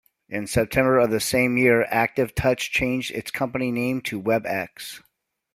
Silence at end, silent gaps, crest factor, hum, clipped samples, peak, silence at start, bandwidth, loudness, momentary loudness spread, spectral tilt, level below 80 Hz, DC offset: 0.55 s; none; 18 dB; none; under 0.1%; -4 dBFS; 0.3 s; 16 kHz; -22 LUFS; 13 LU; -5 dB/octave; -48 dBFS; under 0.1%